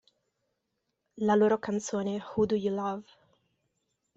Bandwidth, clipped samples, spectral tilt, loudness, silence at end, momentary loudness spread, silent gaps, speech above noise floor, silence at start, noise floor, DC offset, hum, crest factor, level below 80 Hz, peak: 8 kHz; under 0.1%; -6 dB/octave; -29 LUFS; 1.15 s; 9 LU; none; 53 dB; 1.15 s; -82 dBFS; under 0.1%; none; 18 dB; -68 dBFS; -12 dBFS